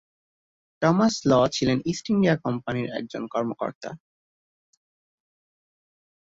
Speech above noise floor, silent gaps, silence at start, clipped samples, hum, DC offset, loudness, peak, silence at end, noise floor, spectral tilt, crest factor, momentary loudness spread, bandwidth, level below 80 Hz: over 66 dB; 3.75-3.81 s; 0.8 s; under 0.1%; none; under 0.1%; -24 LUFS; -6 dBFS; 2.35 s; under -90 dBFS; -6 dB/octave; 20 dB; 12 LU; 8 kHz; -58 dBFS